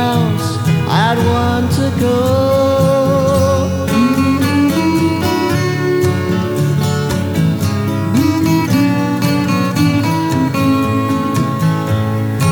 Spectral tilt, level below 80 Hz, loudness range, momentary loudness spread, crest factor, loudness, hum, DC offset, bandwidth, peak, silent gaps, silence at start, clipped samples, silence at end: -6.5 dB/octave; -38 dBFS; 2 LU; 4 LU; 12 dB; -14 LUFS; none; under 0.1%; over 20 kHz; -2 dBFS; none; 0 s; under 0.1%; 0 s